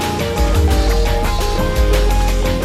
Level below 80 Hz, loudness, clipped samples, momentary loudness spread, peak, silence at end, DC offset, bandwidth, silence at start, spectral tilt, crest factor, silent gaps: -16 dBFS; -17 LUFS; under 0.1%; 3 LU; -2 dBFS; 0 s; under 0.1%; 15 kHz; 0 s; -5 dB/octave; 12 dB; none